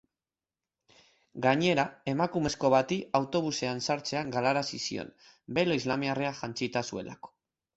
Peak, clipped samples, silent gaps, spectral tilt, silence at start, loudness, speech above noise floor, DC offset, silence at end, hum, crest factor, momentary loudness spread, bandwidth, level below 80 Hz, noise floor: -10 dBFS; under 0.1%; none; -4.5 dB/octave; 1.35 s; -30 LUFS; over 60 dB; under 0.1%; 0.5 s; none; 20 dB; 12 LU; 8.2 kHz; -64 dBFS; under -90 dBFS